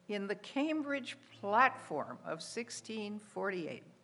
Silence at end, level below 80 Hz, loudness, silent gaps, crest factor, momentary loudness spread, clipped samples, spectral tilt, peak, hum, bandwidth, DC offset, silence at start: 0.1 s; under -90 dBFS; -37 LUFS; none; 24 dB; 14 LU; under 0.1%; -4 dB/octave; -14 dBFS; none; 11.5 kHz; under 0.1%; 0.1 s